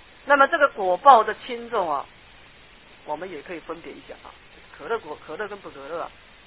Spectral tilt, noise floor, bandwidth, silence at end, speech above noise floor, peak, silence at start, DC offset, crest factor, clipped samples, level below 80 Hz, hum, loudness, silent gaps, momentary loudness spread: -7 dB/octave; -50 dBFS; 4 kHz; 0.4 s; 27 dB; 0 dBFS; 0.25 s; 0.1%; 24 dB; under 0.1%; -58 dBFS; none; -22 LUFS; none; 24 LU